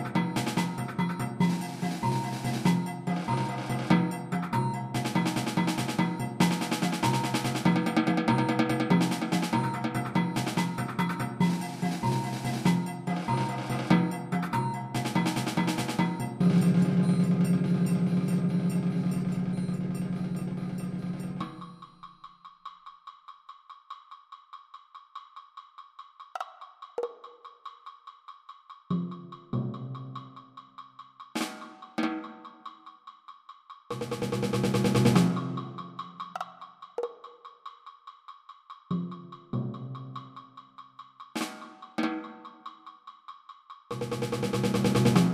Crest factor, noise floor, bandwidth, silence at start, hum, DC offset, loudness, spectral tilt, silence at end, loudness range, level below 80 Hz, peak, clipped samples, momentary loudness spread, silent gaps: 20 dB; -51 dBFS; 15 kHz; 0 s; none; under 0.1%; -29 LUFS; -6 dB/octave; 0 s; 16 LU; -62 dBFS; -10 dBFS; under 0.1%; 24 LU; none